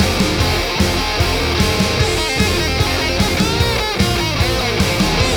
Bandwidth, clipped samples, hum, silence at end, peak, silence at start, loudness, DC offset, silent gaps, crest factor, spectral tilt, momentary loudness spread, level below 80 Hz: over 20 kHz; under 0.1%; none; 0 s; -2 dBFS; 0 s; -16 LUFS; 0.2%; none; 14 dB; -4 dB/octave; 1 LU; -24 dBFS